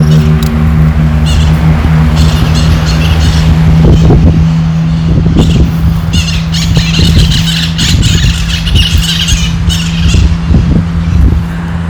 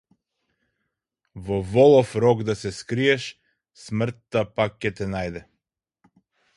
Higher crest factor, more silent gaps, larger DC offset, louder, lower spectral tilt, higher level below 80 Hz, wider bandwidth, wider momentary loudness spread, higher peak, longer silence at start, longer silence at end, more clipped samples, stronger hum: second, 6 dB vs 20 dB; neither; neither; first, -8 LUFS vs -22 LUFS; about the same, -5.5 dB/octave vs -6 dB/octave; first, -12 dBFS vs -52 dBFS; first, over 20 kHz vs 11.5 kHz; second, 4 LU vs 16 LU; first, 0 dBFS vs -4 dBFS; second, 0 s vs 1.35 s; second, 0 s vs 1.15 s; first, 3% vs under 0.1%; neither